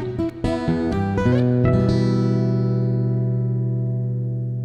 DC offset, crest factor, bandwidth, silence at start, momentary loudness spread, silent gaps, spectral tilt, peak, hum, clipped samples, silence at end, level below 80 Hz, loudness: under 0.1%; 14 dB; 7.8 kHz; 0 s; 7 LU; none; -9 dB/octave; -6 dBFS; none; under 0.1%; 0 s; -40 dBFS; -21 LUFS